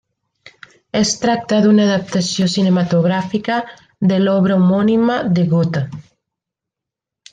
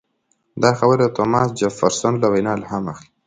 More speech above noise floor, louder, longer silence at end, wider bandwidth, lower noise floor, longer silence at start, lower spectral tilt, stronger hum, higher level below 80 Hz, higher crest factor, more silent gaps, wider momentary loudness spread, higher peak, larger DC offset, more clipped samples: first, 69 dB vs 49 dB; about the same, -16 LUFS vs -18 LUFS; first, 1.3 s vs 0.25 s; about the same, 9.4 kHz vs 9.4 kHz; first, -84 dBFS vs -67 dBFS; first, 0.95 s vs 0.55 s; about the same, -6 dB/octave vs -5.5 dB/octave; neither; about the same, -54 dBFS vs -54 dBFS; about the same, 14 dB vs 18 dB; neither; about the same, 8 LU vs 10 LU; second, -4 dBFS vs 0 dBFS; neither; neither